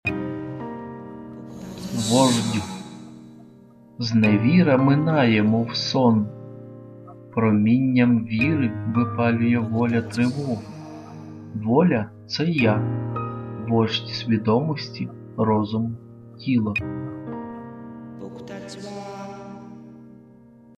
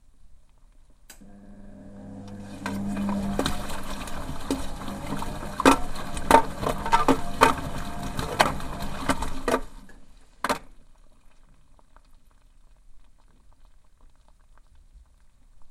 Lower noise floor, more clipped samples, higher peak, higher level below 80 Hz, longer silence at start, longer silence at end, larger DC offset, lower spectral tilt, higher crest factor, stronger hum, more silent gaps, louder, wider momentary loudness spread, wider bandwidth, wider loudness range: second, -49 dBFS vs -54 dBFS; neither; second, -4 dBFS vs 0 dBFS; second, -56 dBFS vs -38 dBFS; second, 0.05 s vs 0.25 s; first, 0.55 s vs 0.05 s; neither; first, -6 dB/octave vs -4.5 dB/octave; second, 18 dB vs 28 dB; neither; neither; first, -22 LUFS vs -26 LUFS; about the same, 21 LU vs 22 LU; second, 13.5 kHz vs 16 kHz; second, 10 LU vs 14 LU